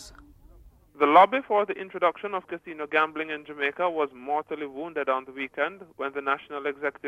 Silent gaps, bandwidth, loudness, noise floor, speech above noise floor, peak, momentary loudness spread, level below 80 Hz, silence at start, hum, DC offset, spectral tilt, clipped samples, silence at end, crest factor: none; 11.5 kHz; -26 LUFS; -53 dBFS; 27 dB; -6 dBFS; 14 LU; -62 dBFS; 0 s; none; under 0.1%; -5 dB/octave; under 0.1%; 0 s; 22 dB